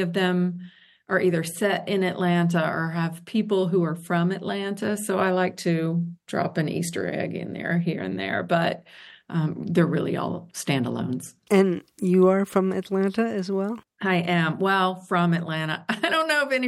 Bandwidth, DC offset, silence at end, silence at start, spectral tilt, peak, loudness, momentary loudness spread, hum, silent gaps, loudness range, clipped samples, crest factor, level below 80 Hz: 12.5 kHz; under 0.1%; 0 s; 0 s; -6 dB/octave; -6 dBFS; -24 LUFS; 7 LU; none; none; 3 LU; under 0.1%; 18 dB; -70 dBFS